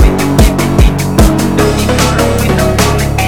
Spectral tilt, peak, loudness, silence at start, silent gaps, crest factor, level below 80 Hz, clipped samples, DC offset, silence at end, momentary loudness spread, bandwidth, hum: -5.5 dB/octave; 0 dBFS; -10 LUFS; 0 s; none; 8 dB; -14 dBFS; 0.2%; under 0.1%; 0 s; 1 LU; 18.5 kHz; none